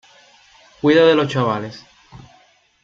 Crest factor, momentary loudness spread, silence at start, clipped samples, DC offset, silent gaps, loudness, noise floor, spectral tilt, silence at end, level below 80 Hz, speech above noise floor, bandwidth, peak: 18 dB; 13 LU; 0.85 s; under 0.1%; under 0.1%; none; -16 LUFS; -55 dBFS; -6.5 dB/octave; 0.65 s; -58 dBFS; 39 dB; 7.6 kHz; -2 dBFS